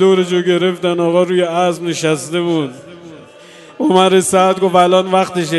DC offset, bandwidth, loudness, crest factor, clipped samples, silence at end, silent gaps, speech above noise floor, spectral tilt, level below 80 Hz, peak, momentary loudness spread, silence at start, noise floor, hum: under 0.1%; 12.5 kHz; -13 LUFS; 14 dB; under 0.1%; 0 s; none; 26 dB; -5 dB/octave; -60 dBFS; 0 dBFS; 7 LU; 0 s; -39 dBFS; none